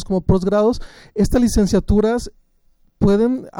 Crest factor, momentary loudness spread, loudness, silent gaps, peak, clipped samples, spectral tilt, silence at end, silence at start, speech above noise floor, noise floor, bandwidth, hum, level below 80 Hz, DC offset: 14 dB; 10 LU; -17 LUFS; none; -4 dBFS; under 0.1%; -7 dB/octave; 0 s; 0 s; 40 dB; -56 dBFS; 17 kHz; none; -28 dBFS; under 0.1%